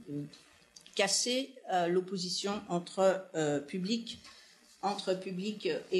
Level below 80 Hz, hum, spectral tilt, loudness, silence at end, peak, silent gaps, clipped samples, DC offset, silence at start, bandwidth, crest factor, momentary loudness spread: -80 dBFS; none; -3.5 dB/octave; -33 LUFS; 0 s; -14 dBFS; none; under 0.1%; under 0.1%; 0 s; 13 kHz; 20 dB; 13 LU